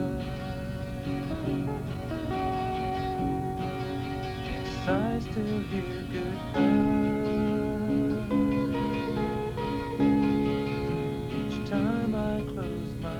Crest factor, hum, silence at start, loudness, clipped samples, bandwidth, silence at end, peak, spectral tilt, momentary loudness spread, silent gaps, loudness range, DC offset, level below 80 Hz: 16 dB; none; 0 s; -30 LUFS; under 0.1%; 17 kHz; 0 s; -14 dBFS; -7.5 dB/octave; 9 LU; none; 4 LU; under 0.1%; -44 dBFS